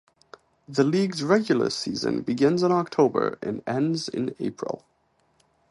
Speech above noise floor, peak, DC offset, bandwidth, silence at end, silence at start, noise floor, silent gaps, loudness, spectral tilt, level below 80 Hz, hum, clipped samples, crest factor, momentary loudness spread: 43 dB; -8 dBFS; under 0.1%; 11.5 kHz; 0.95 s; 0.7 s; -67 dBFS; none; -25 LUFS; -6 dB/octave; -64 dBFS; none; under 0.1%; 18 dB; 10 LU